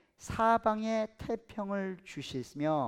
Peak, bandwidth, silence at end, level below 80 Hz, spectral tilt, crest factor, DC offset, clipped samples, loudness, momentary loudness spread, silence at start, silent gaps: -14 dBFS; 15 kHz; 0 s; -60 dBFS; -6 dB/octave; 18 dB; under 0.1%; under 0.1%; -33 LUFS; 13 LU; 0.2 s; none